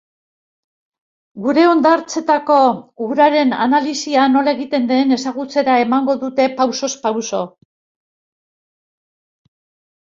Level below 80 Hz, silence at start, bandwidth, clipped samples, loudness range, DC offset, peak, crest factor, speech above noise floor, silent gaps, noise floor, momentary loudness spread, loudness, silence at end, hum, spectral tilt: -64 dBFS; 1.35 s; 7.8 kHz; under 0.1%; 8 LU; under 0.1%; -2 dBFS; 16 dB; over 75 dB; none; under -90 dBFS; 8 LU; -16 LUFS; 2.6 s; none; -3.5 dB/octave